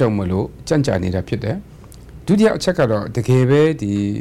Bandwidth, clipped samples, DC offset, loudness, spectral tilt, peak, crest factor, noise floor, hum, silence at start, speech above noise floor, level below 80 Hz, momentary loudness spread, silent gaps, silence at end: 13 kHz; under 0.1%; under 0.1%; -18 LUFS; -7 dB/octave; -6 dBFS; 12 dB; -38 dBFS; none; 0 s; 22 dB; -40 dBFS; 9 LU; none; 0 s